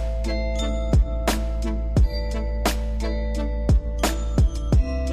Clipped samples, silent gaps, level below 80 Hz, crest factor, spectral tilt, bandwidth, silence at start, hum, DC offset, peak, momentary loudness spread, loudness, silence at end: under 0.1%; none; -22 dBFS; 16 dB; -6 dB/octave; 15 kHz; 0 s; none; 0.3%; -6 dBFS; 5 LU; -24 LUFS; 0 s